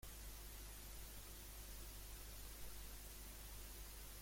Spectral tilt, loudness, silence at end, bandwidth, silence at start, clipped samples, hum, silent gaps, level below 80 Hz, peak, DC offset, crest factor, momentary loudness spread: -2.5 dB/octave; -55 LUFS; 0 s; 16.5 kHz; 0 s; under 0.1%; none; none; -56 dBFS; -40 dBFS; under 0.1%; 14 dB; 0 LU